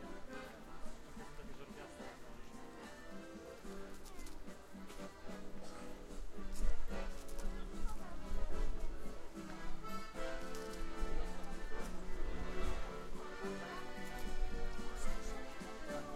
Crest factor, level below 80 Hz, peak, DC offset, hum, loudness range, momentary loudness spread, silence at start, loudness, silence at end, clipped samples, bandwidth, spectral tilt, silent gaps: 18 dB; -44 dBFS; -20 dBFS; under 0.1%; none; 6 LU; 8 LU; 0 s; -49 LUFS; 0 s; under 0.1%; 12 kHz; -5 dB/octave; none